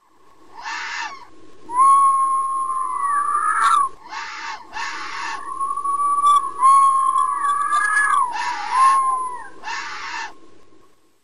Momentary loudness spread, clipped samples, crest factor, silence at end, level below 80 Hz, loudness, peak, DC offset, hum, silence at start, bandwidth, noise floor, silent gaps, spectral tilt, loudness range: 16 LU; under 0.1%; 14 dB; 0 s; -64 dBFS; -19 LUFS; -6 dBFS; 1%; none; 0 s; 10.5 kHz; -52 dBFS; none; 0.5 dB/octave; 5 LU